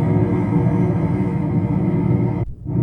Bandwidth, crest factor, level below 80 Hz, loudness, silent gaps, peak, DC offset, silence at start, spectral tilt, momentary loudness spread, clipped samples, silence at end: 4 kHz; 14 dB; -36 dBFS; -19 LUFS; none; -4 dBFS; under 0.1%; 0 s; -11 dB/octave; 4 LU; under 0.1%; 0 s